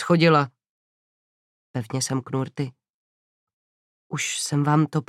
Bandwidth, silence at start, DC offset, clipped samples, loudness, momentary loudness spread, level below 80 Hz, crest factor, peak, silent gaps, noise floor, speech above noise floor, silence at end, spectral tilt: 14.5 kHz; 0 s; under 0.1%; under 0.1%; -23 LUFS; 15 LU; -70 dBFS; 20 dB; -6 dBFS; 0.69-1.74 s, 2.90-3.47 s, 3.53-4.10 s; under -90 dBFS; over 68 dB; 0.05 s; -5 dB/octave